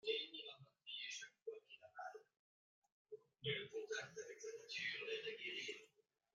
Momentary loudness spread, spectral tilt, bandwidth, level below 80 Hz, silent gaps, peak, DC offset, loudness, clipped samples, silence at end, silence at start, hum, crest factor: 15 LU; -2 dB/octave; 9.6 kHz; under -90 dBFS; 1.42-1.46 s, 2.39-2.82 s, 2.92-3.05 s; -28 dBFS; under 0.1%; -49 LUFS; under 0.1%; 0.5 s; 0.05 s; none; 22 dB